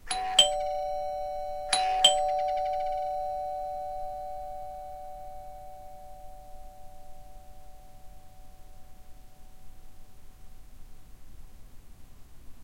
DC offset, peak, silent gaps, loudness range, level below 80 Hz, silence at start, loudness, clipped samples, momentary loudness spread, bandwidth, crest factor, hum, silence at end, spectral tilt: 0.3%; -4 dBFS; none; 25 LU; -50 dBFS; 0 s; -28 LUFS; under 0.1%; 27 LU; 16.5 kHz; 28 dB; none; 0 s; 0 dB/octave